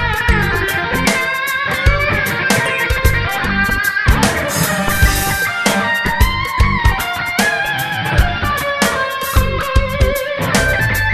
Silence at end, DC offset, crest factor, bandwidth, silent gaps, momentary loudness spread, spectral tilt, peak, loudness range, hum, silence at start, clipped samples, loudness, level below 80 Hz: 0 s; under 0.1%; 14 dB; 14.5 kHz; none; 3 LU; -4 dB/octave; 0 dBFS; 1 LU; none; 0 s; under 0.1%; -15 LUFS; -22 dBFS